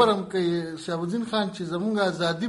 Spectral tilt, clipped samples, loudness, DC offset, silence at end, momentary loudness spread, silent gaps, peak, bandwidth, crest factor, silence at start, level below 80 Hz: -5.5 dB/octave; under 0.1%; -26 LUFS; under 0.1%; 0 s; 5 LU; none; -6 dBFS; 11.5 kHz; 18 dB; 0 s; -64 dBFS